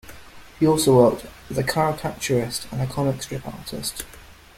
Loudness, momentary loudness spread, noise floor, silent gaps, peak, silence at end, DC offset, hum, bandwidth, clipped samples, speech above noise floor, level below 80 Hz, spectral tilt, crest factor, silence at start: -22 LUFS; 16 LU; -42 dBFS; none; -2 dBFS; 0.25 s; under 0.1%; none; 16.5 kHz; under 0.1%; 21 dB; -48 dBFS; -5 dB/octave; 20 dB; 0.05 s